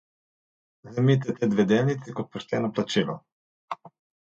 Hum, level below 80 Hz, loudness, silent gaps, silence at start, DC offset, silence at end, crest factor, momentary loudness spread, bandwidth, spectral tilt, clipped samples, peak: none; -66 dBFS; -25 LUFS; 3.32-3.68 s; 0.85 s; under 0.1%; 0.35 s; 18 dB; 17 LU; 8 kHz; -7 dB/octave; under 0.1%; -8 dBFS